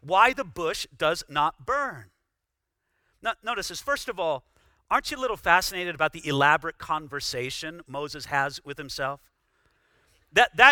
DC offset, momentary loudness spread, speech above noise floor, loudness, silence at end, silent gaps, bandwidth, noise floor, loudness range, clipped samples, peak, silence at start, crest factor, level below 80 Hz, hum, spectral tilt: under 0.1%; 13 LU; 57 dB; -26 LUFS; 0 s; none; 19.5 kHz; -82 dBFS; 6 LU; under 0.1%; 0 dBFS; 0.05 s; 26 dB; -56 dBFS; none; -3 dB/octave